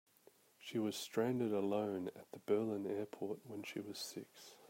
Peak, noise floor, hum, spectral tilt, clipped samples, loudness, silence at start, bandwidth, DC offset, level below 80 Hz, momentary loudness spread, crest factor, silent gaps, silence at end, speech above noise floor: -22 dBFS; -69 dBFS; none; -5.5 dB/octave; under 0.1%; -41 LUFS; 0.6 s; 16 kHz; under 0.1%; -88 dBFS; 11 LU; 18 dB; none; 0.05 s; 28 dB